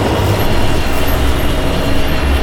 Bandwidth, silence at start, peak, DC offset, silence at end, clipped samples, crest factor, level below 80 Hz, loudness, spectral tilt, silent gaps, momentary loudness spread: 17 kHz; 0 s; -2 dBFS; under 0.1%; 0 s; under 0.1%; 10 dB; -16 dBFS; -15 LUFS; -5.5 dB/octave; none; 2 LU